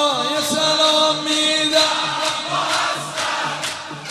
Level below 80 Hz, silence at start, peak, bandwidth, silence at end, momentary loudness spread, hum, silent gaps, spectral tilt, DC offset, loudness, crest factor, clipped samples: -62 dBFS; 0 s; -2 dBFS; 16 kHz; 0 s; 8 LU; none; none; -1.5 dB/octave; under 0.1%; -17 LUFS; 18 dB; under 0.1%